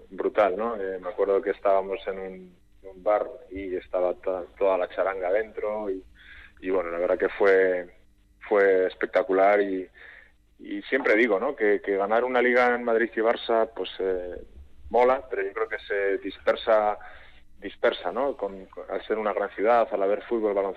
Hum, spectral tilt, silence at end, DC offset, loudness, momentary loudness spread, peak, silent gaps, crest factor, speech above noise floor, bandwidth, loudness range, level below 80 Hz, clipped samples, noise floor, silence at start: none; -6 dB/octave; 0 s; under 0.1%; -25 LUFS; 14 LU; -10 dBFS; none; 14 dB; 26 dB; 6.4 kHz; 5 LU; -56 dBFS; under 0.1%; -51 dBFS; 0 s